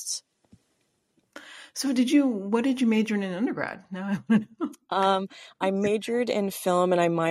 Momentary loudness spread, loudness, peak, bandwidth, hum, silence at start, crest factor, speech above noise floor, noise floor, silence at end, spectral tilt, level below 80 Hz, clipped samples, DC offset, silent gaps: 13 LU; -26 LUFS; -8 dBFS; 15.5 kHz; none; 0 s; 18 dB; 47 dB; -72 dBFS; 0 s; -5 dB/octave; -72 dBFS; under 0.1%; under 0.1%; none